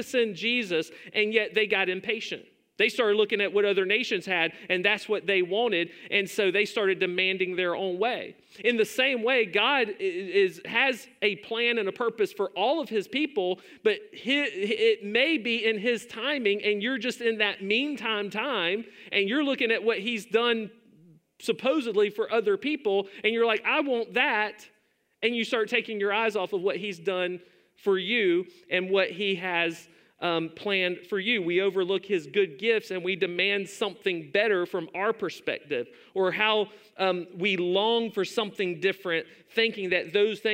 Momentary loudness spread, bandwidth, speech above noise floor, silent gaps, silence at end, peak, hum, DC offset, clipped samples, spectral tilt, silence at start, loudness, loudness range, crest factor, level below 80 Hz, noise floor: 6 LU; 16 kHz; 31 dB; none; 0 s; -6 dBFS; none; under 0.1%; under 0.1%; -4 dB/octave; 0 s; -26 LUFS; 2 LU; 20 dB; -82 dBFS; -57 dBFS